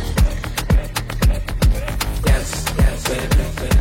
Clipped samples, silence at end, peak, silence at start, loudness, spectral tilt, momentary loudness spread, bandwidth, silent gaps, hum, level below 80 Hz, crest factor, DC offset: under 0.1%; 0 s; -4 dBFS; 0 s; -20 LUFS; -5 dB/octave; 4 LU; 16.5 kHz; none; none; -20 dBFS; 12 dB; under 0.1%